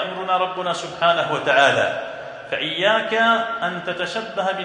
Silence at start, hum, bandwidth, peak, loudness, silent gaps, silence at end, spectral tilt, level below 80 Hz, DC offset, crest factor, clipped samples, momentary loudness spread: 0 s; none; 10.5 kHz; -2 dBFS; -20 LUFS; none; 0 s; -3.5 dB/octave; -66 dBFS; under 0.1%; 18 dB; under 0.1%; 9 LU